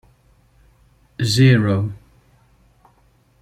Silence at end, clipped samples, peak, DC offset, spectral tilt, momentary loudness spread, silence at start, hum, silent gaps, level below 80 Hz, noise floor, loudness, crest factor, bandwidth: 1.45 s; under 0.1%; -2 dBFS; under 0.1%; -6 dB/octave; 26 LU; 1.2 s; none; none; -52 dBFS; -57 dBFS; -17 LUFS; 18 dB; 13.5 kHz